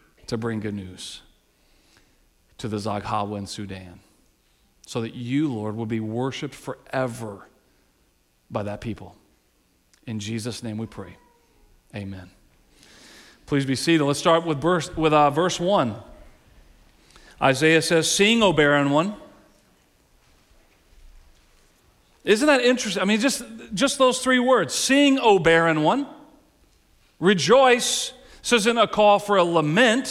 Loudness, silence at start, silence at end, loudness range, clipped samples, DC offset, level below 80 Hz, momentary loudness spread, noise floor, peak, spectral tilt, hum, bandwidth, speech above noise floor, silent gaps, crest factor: -21 LUFS; 0.3 s; 0 s; 15 LU; under 0.1%; under 0.1%; -54 dBFS; 19 LU; -64 dBFS; -6 dBFS; -4 dB/octave; none; 16 kHz; 43 dB; none; 18 dB